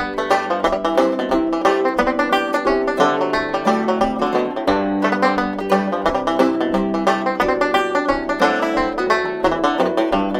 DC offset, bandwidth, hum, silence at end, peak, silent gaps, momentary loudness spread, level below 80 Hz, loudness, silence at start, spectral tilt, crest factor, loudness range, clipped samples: under 0.1%; 15.5 kHz; none; 0 s; -2 dBFS; none; 3 LU; -42 dBFS; -18 LUFS; 0 s; -5.5 dB/octave; 16 dB; 1 LU; under 0.1%